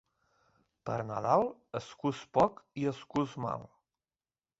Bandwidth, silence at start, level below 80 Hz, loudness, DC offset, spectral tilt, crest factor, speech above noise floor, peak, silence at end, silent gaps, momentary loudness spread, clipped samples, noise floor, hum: 8 kHz; 0.85 s; -68 dBFS; -33 LUFS; under 0.1%; -7 dB/octave; 22 dB; over 57 dB; -12 dBFS; 0.95 s; none; 13 LU; under 0.1%; under -90 dBFS; none